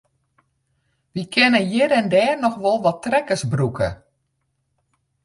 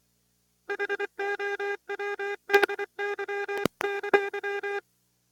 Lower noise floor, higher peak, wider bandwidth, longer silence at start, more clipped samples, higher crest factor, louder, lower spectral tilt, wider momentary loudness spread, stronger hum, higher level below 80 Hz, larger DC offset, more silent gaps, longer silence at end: about the same, -72 dBFS vs -71 dBFS; first, -2 dBFS vs -6 dBFS; second, 11.5 kHz vs 18 kHz; first, 1.15 s vs 0.7 s; neither; second, 18 dB vs 24 dB; first, -19 LUFS vs -29 LUFS; first, -5.5 dB/octave vs -3.5 dB/octave; about the same, 10 LU vs 10 LU; second, none vs 60 Hz at -70 dBFS; first, -50 dBFS vs -72 dBFS; neither; neither; first, 1.3 s vs 0.5 s